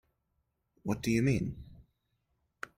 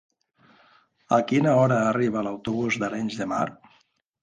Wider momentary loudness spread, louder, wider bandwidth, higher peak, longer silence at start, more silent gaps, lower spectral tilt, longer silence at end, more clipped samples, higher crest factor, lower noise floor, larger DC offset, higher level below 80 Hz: first, 18 LU vs 9 LU; second, -32 LUFS vs -24 LUFS; first, 16 kHz vs 9.8 kHz; second, -18 dBFS vs -8 dBFS; second, 0.85 s vs 1.1 s; neither; about the same, -6.5 dB/octave vs -6.5 dB/octave; second, 0.1 s vs 0.7 s; neither; about the same, 18 dB vs 18 dB; first, -80 dBFS vs -65 dBFS; neither; first, -56 dBFS vs -64 dBFS